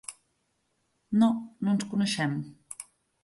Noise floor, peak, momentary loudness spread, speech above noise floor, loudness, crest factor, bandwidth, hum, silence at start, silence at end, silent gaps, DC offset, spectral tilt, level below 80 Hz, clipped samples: -75 dBFS; -12 dBFS; 18 LU; 48 dB; -28 LUFS; 18 dB; 11.5 kHz; none; 0.1 s; 0.4 s; none; under 0.1%; -5 dB/octave; -72 dBFS; under 0.1%